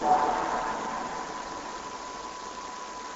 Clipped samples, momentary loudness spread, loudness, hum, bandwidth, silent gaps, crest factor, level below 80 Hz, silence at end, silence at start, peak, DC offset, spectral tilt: under 0.1%; 12 LU; -32 LUFS; none; 8.2 kHz; none; 20 dB; -56 dBFS; 0 s; 0 s; -12 dBFS; under 0.1%; -3 dB/octave